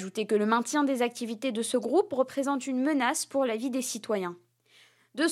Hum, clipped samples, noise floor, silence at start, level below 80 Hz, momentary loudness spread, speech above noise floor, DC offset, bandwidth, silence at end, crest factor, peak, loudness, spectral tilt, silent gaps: none; under 0.1%; -61 dBFS; 0 s; -86 dBFS; 6 LU; 33 dB; under 0.1%; 15.5 kHz; 0 s; 18 dB; -10 dBFS; -28 LUFS; -3.5 dB/octave; none